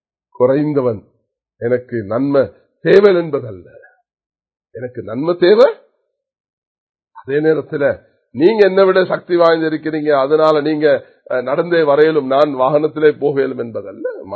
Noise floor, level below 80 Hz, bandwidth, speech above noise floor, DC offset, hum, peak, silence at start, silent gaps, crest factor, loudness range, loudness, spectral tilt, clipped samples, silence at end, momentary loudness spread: -66 dBFS; -58 dBFS; 6.4 kHz; 52 dB; under 0.1%; none; 0 dBFS; 0.4 s; 4.26-4.30 s, 6.40-6.44 s, 6.53-6.94 s; 16 dB; 4 LU; -14 LUFS; -8 dB/octave; under 0.1%; 0 s; 14 LU